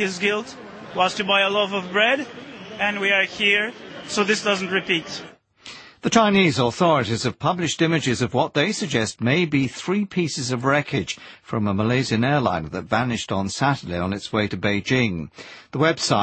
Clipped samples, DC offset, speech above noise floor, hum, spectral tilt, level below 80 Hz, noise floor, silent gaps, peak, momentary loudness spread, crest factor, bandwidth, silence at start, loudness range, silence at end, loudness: under 0.1%; under 0.1%; 22 dB; none; -4.5 dB/octave; -54 dBFS; -43 dBFS; none; -4 dBFS; 14 LU; 18 dB; 8.8 kHz; 0 s; 3 LU; 0 s; -21 LUFS